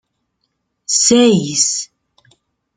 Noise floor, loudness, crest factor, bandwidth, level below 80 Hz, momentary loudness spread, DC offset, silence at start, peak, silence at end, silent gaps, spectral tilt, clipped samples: -70 dBFS; -13 LUFS; 18 dB; 9.6 kHz; -58 dBFS; 19 LU; under 0.1%; 0.9 s; 0 dBFS; 0.9 s; none; -3 dB/octave; under 0.1%